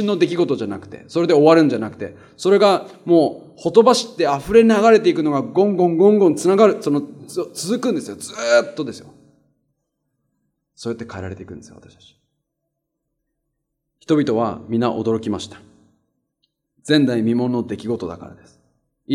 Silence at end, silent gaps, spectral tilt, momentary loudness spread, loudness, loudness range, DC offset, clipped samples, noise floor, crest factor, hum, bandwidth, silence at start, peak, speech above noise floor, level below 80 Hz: 0 s; none; -5.5 dB/octave; 18 LU; -17 LUFS; 20 LU; under 0.1%; under 0.1%; -77 dBFS; 18 dB; none; 15 kHz; 0 s; 0 dBFS; 60 dB; -56 dBFS